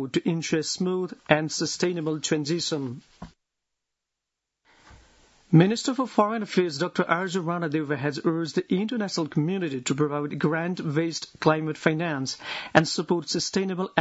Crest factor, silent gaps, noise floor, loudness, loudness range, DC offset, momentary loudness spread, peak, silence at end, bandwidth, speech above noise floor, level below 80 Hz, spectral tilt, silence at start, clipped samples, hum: 26 dB; none; -85 dBFS; -26 LUFS; 5 LU; under 0.1%; 6 LU; 0 dBFS; 0 s; 8 kHz; 60 dB; -64 dBFS; -5 dB/octave; 0 s; under 0.1%; none